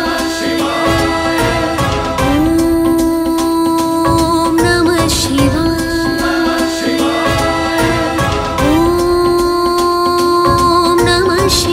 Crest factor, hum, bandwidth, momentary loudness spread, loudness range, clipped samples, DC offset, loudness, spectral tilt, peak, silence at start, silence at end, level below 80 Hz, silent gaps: 12 dB; none; 16 kHz; 4 LU; 2 LU; under 0.1%; under 0.1%; -13 LUFS; -4.5 dB/octave; 0 dBFS; 0 s; 0 s; -28 dBFS; none